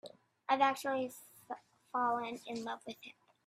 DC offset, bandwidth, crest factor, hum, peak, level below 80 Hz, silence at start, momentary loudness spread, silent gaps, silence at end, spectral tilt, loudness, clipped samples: under 0.1%; 16 kHz; 24 dB; none; -14 dBFS; -86 dBFS; 0.05 s; 20 LU; none; 0.35 s; -3.5 dB/octave; -36 LUFS; under 0.1%